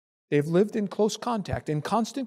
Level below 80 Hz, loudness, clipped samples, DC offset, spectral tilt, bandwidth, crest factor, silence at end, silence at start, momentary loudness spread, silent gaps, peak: -54 dBFS; -27 LUFS; under 0.1%; under 0.1%; -6 dB/octave; 15 kHz; 16 dB; 0 s; 0.3 s; 6 LU; none; -10 dBFS